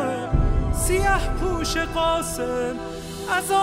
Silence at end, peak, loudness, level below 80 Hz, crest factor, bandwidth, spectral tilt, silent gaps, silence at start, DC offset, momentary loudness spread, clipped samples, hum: 0 s; -8 dBFS; -24 LUFS; -28 dBFS; 14 dB; 16 kHz; -4.5 dB/octave; none; 0 s; under 0.1%; 7 LU; under 0.1%; none